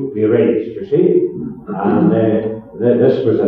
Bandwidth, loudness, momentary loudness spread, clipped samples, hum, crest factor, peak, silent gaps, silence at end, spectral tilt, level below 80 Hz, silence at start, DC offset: 5 kHz; -15 LUFS; 9 LU; under 0.1%; none; 14 dB; 0 dBFS; none; 0 s; -11 dB/octave; -52 dBFS; 0 s; under 0.1%